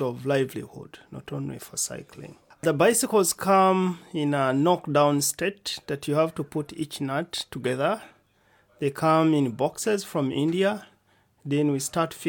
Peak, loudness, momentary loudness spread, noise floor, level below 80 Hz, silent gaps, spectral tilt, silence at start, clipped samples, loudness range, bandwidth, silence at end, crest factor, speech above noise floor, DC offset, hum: -8 dBFS; -25 LUFS; 14 LU; -64 dBFS; -64 dBFS; none; -4.5 dB/octave; 0 s; under 0.1%; 5 LU; 19 kHz; 0 s; 18 dB; 39 dB; under 0.1%; none